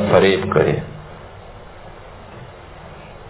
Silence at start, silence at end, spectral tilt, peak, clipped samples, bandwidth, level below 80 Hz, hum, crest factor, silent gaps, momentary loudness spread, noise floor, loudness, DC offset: 0 s; 0 s; -10.5 dB/octave; 0 dBFS; under 0.1%; 4 kHz; -42 dBFS; none; 20 dB; none; 25 LU; -38 dBFS; -17 LUFS; under 0.1%